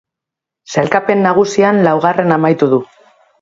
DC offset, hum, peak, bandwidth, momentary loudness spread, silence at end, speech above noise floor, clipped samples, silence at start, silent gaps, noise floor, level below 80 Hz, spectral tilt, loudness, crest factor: under 0.1%; none; 0 dBFS; 7.8 kHz; 5 LU; 0.6 s; 72 dB; under 0.1%; 0.7 s; none; -83 dBFS; -56 dBFS; -6.5 dB/octave; -12 LUFS; 14 dB